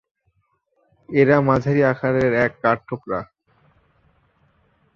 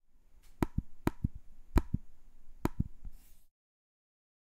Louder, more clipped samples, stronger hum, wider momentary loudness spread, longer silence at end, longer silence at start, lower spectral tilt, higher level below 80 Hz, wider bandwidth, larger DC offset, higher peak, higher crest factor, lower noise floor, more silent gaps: first, -19 LUFS vs -38 LUFS; neither; neither; second, 12 LU vs 16 LU; first, 1.7 s vs 1 s; first, 1.1 s vs 0.15 s; first, -9 dB/octave vs -7.5 dB/octave; second, -52 dBFS vs -44 dBFS; second, 7.2 kHz vs 16 kHz; neither; first, -2 dBFS vs -12 dBFS; second, 20 dB vs 26 dB; first, -68 dBFS vs -57 dBFS; neither